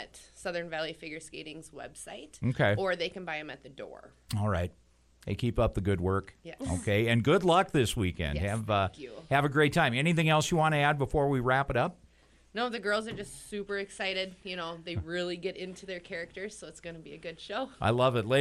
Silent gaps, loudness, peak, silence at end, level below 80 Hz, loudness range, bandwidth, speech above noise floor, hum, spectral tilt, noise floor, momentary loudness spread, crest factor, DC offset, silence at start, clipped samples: none; -30 LUFS; -12 dBFS; 0 s; -50 dBFS; 9 LU; 13.5 kHz; 31 dB; none; -5.5 dB/octave; -61 dBFS; 19 LU; 18 dB; under 0.1%; 0 s; under 0.1%